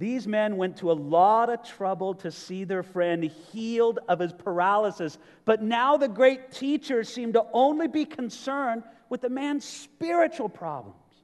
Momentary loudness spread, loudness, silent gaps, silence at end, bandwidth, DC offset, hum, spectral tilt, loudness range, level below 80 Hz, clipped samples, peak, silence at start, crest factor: 14 LU; -26 LUFS; none; 0.3 s; 12 kHz; under 0.1%; none; -5.5 dB/octave; 4 LU; -78 dBFS; under 0.1%; -8 dBFS; 0 s; 18 dB